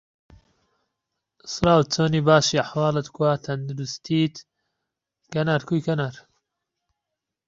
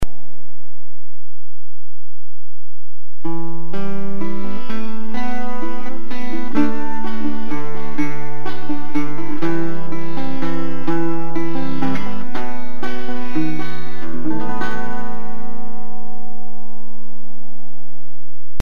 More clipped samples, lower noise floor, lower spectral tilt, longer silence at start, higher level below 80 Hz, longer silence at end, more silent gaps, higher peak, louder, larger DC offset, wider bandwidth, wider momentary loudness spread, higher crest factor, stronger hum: neither; first, -84 dBFS vs -56 dBFS; second, -5.5 dB/octave vs -7.5 dB/octave; first, 1.45 s vs 0 s; second, -54 dBFS vs -46 dBFS; first, 1.3 s vs 0.25 s; neither; about the same, -2 dBFS vs 0 dBFS; first, -22 LUFS vs -27 LUFS; second, under 0.1% vs 50%; second, 7.8 kHz vs 13.5 kHz; second, 13 LU vs 16 LU; about the same, 22 dB vs 20 dB; neither